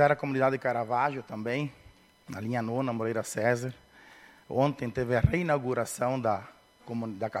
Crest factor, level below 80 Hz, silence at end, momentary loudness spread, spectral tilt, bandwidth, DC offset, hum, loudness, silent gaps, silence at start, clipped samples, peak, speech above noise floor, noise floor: 22 dB; -50 dBFS; 0 s; 10 LU; -6.5 dB/octave; 16 kHz; under 0.1%; none; -30 LUFS; none; 0 s; under 0.1%; -8 dBFS; 26 dB; -54 dBFS